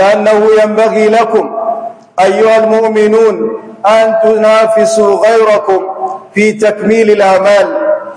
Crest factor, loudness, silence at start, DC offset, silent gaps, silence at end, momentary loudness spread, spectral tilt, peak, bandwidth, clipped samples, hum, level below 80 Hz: 8 dB; -8 LUFS; 0 s; under 0.1%; none; 0 s; 9 LU; -5 dB/octave; 0 dBFS; 11 kHz; 2%; none; -56 dBFS